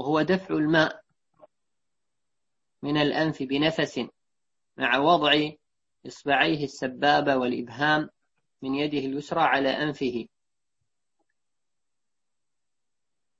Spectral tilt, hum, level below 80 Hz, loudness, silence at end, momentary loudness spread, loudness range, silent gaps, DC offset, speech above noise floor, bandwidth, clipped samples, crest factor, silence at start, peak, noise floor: -5.5 dB/octave; none; -64 dBFS; -25 LUFS; 3.15 s; 15 LU; 5 LU; none; under 0.1%; 63 dB; 7.8 kHz; under 0.1%; 22 dB; 0 s; -6 dBFS; -88 dBFS